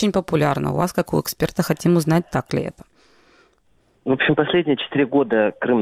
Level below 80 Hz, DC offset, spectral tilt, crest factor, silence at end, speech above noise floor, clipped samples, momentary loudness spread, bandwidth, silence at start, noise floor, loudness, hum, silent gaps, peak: -50 dBFS; under 0.1%; -6 dB/octave; 16 dB; 0 s; 41 dB; under 0.1%; 6 LU; 16.5 kHz; 0 s; -60 dBFS; -20 LUFS; none; none; -4 dBFS